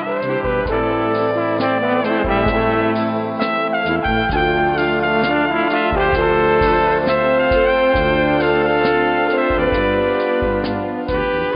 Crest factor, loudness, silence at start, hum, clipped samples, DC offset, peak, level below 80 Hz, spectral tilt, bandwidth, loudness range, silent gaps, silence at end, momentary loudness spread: 14 dB; -17 LUFS; 0 s; none; under 0.1%; under 0.1%; -2 dBFS; -32 dBFS; -8.5 dB/octave; 5.4 kHz; 3 LU; none; 0 s; 5 LU